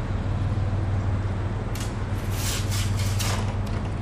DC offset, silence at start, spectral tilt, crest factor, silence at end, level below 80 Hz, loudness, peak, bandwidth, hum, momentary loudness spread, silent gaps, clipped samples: under 0.1%; 0 s; -5 dB/octave; 12 dB; 0 s; -32 dBFS; -27 LUFS; -14 dBFS; 16 kHz; none; 4 LU; none; under 0.1%